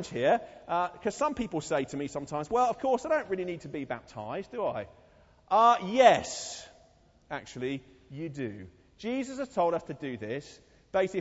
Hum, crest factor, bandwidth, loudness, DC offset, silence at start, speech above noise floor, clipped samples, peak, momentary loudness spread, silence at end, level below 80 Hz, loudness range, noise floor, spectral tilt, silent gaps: none; 22 dB; 8 kHz; -30 LUFS; under 0.1%; 0 s; 32 dB; under 0.1%; -8 dBFS; 17 LU; 0 s; -62 dBFS; 8 LU; -62 dBFS; -4.5 dB/octave; none